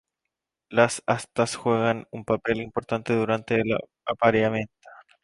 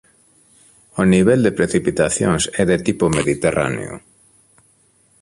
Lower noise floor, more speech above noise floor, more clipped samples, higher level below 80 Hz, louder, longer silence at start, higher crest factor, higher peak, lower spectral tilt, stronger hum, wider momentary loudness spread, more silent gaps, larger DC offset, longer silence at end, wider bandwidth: first, -84 dBFS vs -57 dBFS; first, 60 dB vs 40 dB; neither; second, -58 dBFS vs -42 dBFS; second, -25 LUFS vs -17 LUFS; second, 0.7 s vs 0.95 s; about the same, 22 dB vs 18 dB; second, -4 dBFS vs 0 dBFS; about the same, -5.5 dB/octave vs -5.5 dB/octave; neither; second, 7 LU vs 12 LU; neither; neither; second, 0.3 s vs 1.25 s; about the same, 11.5 kHz vs 11.5 kHz